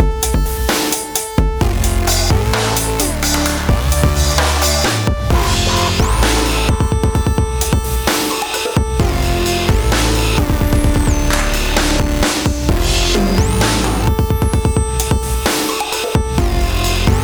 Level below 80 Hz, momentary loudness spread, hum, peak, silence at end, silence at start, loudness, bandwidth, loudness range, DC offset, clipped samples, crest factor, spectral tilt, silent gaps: -18 dBFS; 3 LU; none; 0 dBFS; 0 s; 0 s; -15 LUFS; over 20 kHz; 2 LU; under 0.1%; under 0.1%; 14 dB; -4 dB/octave; none